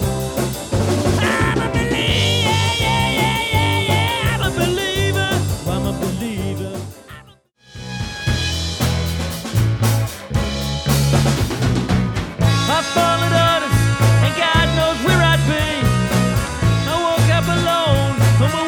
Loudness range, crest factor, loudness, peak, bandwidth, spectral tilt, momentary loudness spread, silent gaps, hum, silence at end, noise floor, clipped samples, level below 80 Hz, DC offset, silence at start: 7 LU; 16 dB; -17 LUFS; -2 dBFS; 19.5 kHz; -5 dB/octave; 8 LU; none; none; 0 s; -48 dBFS; under 0.1%; -30 dBFS; under 0.1%; 0 s